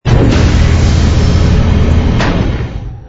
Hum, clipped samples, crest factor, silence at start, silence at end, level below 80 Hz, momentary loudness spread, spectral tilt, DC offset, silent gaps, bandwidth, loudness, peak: none; under 0.1%; 8 dB; 0.05 s; 0 s; -12 dBFS; 6 LU; -6.5 dB/octave; under 0.1%; none; 8 kHz; -11 LUFS; 0 dBFS